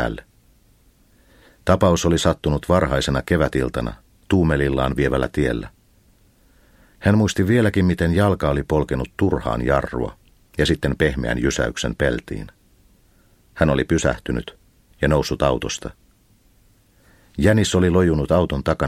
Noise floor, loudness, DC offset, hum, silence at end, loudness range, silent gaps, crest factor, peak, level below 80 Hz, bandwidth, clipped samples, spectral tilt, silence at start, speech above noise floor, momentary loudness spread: -56 dBFS; -20 LUFS; under 0.1%; none; 0 s; 4 LU; none; 20 dB; 0 dBFS; -34 dBFS; 15.5 kHz; under 0.1%; -6 dB/octave; 0 s; 37 dB; 11 LU